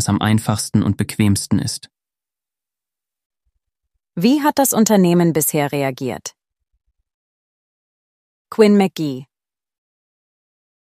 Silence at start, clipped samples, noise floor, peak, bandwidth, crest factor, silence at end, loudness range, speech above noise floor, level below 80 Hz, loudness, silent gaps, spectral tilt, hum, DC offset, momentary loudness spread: 0 s; under 0.1%; under -90 dBFS; 0 dBFS; 15.5 kHz; 18 dB; 1.75 s; 7 LU; over 74 dB; -54 dBFS; -17 LUFS; 3.26-3.30 s, 7.14-8.45 s; -5.5 dB/octave; none; under 0.1%; 14 LU